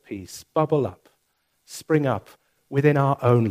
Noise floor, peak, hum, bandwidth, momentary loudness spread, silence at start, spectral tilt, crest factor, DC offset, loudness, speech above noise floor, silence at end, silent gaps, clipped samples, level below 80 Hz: -71 dBFS; -4 dBFS; none; 15.5 kHz; 16 LU; 0.1 s; -7.5 dB/octave; 20 dB; under 0.1%; -23 LUFS; 49 dB; 0 s; none; under 0.1%; -62 dBFS